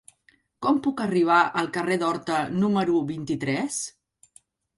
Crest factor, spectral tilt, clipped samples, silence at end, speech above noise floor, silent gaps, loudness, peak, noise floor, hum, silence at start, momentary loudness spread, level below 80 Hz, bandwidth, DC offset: 20 dB; -5 dB/octave; under 0.1%; 0.9 s; 40 dB; none; -24 LUFS; -6 dBFS; -63 dBFS; none; 0.6 s; 9 LU; -64 dBFS; 11.5 kHz; under 0.1%